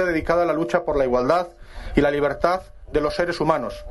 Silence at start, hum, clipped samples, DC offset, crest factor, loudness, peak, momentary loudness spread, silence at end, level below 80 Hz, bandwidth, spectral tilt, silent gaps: 0 s; none; under 0.1%; under 0.1%; 18 dB; -22 LUFS; -4 dBFS; 6 LU; 0 s; -38 dBFS; 11.5 kHz; -6.5 dB/octave; none